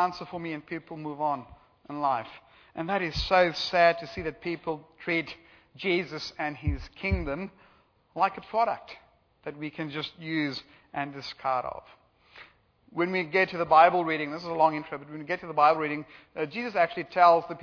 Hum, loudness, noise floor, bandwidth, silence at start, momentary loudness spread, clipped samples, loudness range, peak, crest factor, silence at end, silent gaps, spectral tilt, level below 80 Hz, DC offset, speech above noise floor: none; -28 LUFS; -63 dBFS; 5.4 kHz; 0 s; 17 LU; under 0.1%; 8 LU; -6 dBFS; 22 dB; 0 s; none; -6 dB/octave; -48 dBFS; under 0.1%; 35 dB